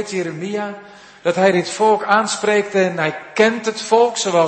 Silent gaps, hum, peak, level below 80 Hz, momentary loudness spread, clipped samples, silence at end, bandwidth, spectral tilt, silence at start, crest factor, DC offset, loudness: none; none; 0 dBFS; -66 dBFS; 9 LU; under 0.1%; 0 s; 8.8 kHz; -4 dB/octave; 0 s; 16 dB; under 0.1%; -17 LUFS